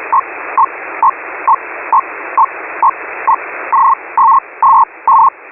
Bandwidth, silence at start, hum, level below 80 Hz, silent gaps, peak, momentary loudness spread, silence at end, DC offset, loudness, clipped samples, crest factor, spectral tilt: 2.9 kHz; 0 s; none; -58 dBFS; none; -2 dBFS; 6 LU; 0 s; under 0.1%; -12 LUFS; under 0.1%; 10 dB; -8 dB/octave